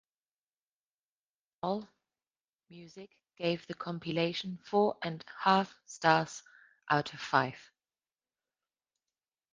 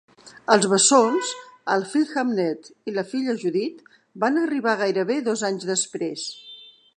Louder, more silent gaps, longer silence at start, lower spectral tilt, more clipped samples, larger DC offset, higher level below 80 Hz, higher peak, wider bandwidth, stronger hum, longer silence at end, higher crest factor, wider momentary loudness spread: second, -32 LUFS vs -22 LUFS; first, 2.44-2.53 s vs none; first, 1.65 s vs 0.25 s; first, -5 dB/octave vs -3 dB/octave; neither; neither; about the same, -74 dBFS vs -76 dBFS; second, -10 dBFS vs -2 dBFS; second, 9.6 kHz vs 11 kHz; neither; first, 1.9 s vs 0.3 s; about the same, 26 dB vs 22 dB; first, 19 LU vs 16 LU